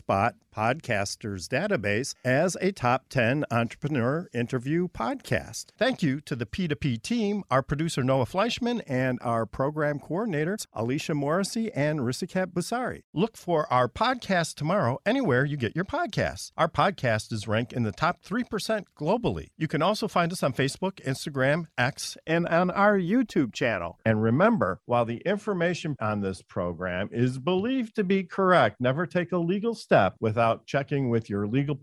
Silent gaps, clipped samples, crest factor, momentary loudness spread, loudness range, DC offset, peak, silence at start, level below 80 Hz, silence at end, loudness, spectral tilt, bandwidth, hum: 13.04-13.13 s; under 0.1%; 20 dB; 7 LU; 3 LU; under 0.1%; -6 dBFS; 0.1 s; -56 dBFS; 0.05 s; -27 LUFS; -6 dB/octave; 14.5 kHz; none